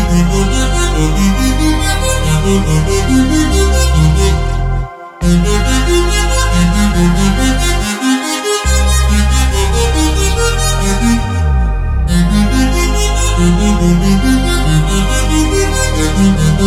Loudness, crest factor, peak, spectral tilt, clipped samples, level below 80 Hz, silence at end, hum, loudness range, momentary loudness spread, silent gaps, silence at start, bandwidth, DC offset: -12 LUFS; 10 dB; 0 dBFS; -5 dB/octave; under 0.1%; -14 dBFS; 0 s; none; 1 LU; 3 LU; none; 0 s; 15 kHz; under 0.1%